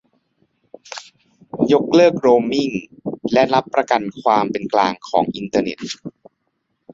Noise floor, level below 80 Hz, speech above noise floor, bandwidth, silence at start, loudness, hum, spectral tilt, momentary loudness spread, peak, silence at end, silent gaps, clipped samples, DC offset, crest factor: -71 dBFS; -60 dBFS; 54 dB; 7.8 kHz; 0.9 s; -18 LUFS; none; -5.5 dB/octave; 20 LU; -2 dBFS; 0.85 s; none; under 0.1%; under 0.1%; 18 dB